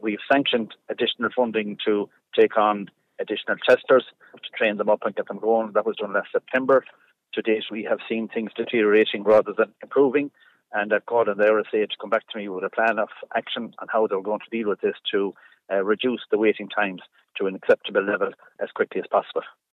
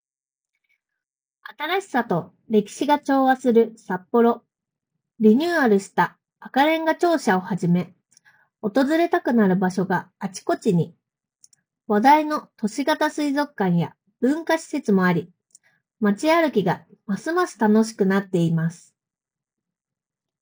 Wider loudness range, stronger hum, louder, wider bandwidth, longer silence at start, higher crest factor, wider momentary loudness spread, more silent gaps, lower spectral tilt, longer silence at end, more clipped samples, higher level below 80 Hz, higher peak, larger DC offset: about the same, 4 LU vs 3 LU; neither; about the same, -23 LUFS vs -21 LUFS; second, 6 kHz vs over 20 kHz; second, 0.05 s vs 1.5 s; about the same, 18 dB vs 20 dB; about the same, 11 LU vs 9 LU; neither; about the same, -6.5 dB/octave vs -6.5 dB/octave; second, 0.25 s vs 1.65 s; neither; second, -76 dBFS vs -70 dBFS; second, -6 dBFS vs -2 dBFS; neither